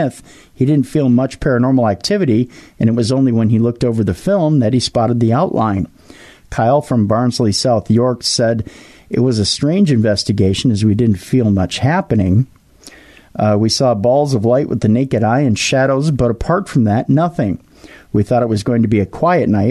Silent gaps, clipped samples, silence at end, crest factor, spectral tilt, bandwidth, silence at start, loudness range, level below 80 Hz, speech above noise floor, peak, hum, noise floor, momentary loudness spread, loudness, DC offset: none; under 0.1%; 0 s; 10 dB; -6 dB/octave; 12.5 kHz; 0 s; 2 LU; -40 dBFS; 28 dB; -4 dBFS; none; -41 dBFS; 5 LU; -15 LUFS; under 0.1%